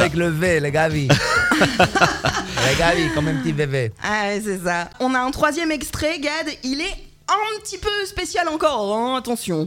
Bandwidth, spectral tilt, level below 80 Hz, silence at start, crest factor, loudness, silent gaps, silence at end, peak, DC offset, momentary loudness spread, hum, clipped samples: 17.5 kHz; -4.5 dB/octave; -40 dBFS; 0 s; 20 dB; -20 LUFS; none; 0 s; 0 dBFS; under 0.1%; 8 LU; none; under 0.1%